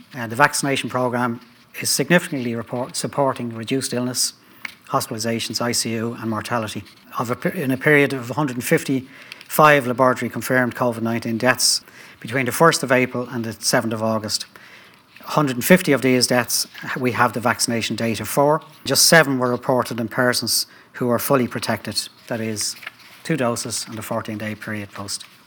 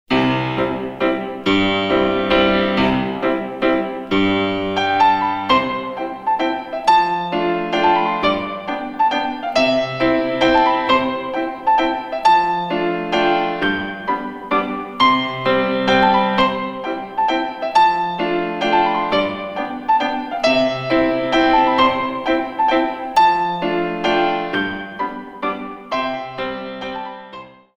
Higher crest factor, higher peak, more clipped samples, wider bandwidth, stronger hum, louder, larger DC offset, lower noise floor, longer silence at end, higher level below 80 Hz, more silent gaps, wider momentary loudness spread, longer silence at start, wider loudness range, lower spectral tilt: about the same, 20 dB vs 18 dB; about the same, 0 dBFS vs 0 dBFS; neither; first, over 20 kHz vs 10.5 kHz; neither; about the same, -20 LUFS vs -18 LUFS; neither; first, -47 dBFS vs -38 dBFS; about the same, 0.2 s vs 0.3 s; second, -64 dBFS vs -46 dBFS; neither; first, 13 LU vs 10 LU; about the same, 0.1 s vs 0.1 s; first, 6 LU vs 2 LU; second, -3.5 dB/octave vs -5.5 dB/octave